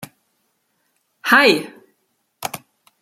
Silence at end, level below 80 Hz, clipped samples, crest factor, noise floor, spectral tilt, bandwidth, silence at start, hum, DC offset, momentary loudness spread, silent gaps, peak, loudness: 0.45 s; -70 dBFS; under 0.1%; 22 dB; -69 dBFS; -3 dB/octave; 16 kHz; 0 s; none; under 0.1%; 23 LU; none; 0 dBFS; -16 LUFS